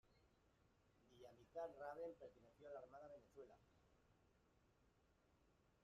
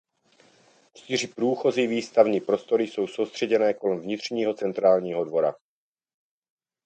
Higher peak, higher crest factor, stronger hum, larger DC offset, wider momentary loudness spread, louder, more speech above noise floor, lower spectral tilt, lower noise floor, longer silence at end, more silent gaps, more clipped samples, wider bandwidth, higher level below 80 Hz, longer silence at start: second, -42 dBFS vs -4 dBFS; about the same, 20 dB vs 22 dB; neither; neither; first, 13 LU vs 7 LU; second, -59 LUFS vs -25 LUFS; second, 22 dB vs 37 dB; about the same, -4.5 dB/octave vs -5 dB/octave; first, -80 dBFS vs -61 dBFS; second, 0 s vs 1.3 s; neither; neither; second, 7.4 kHz vs 9 kHz; second, -84 dBFS vs -74 dBFS; second, 0.05 s vs 1.1 s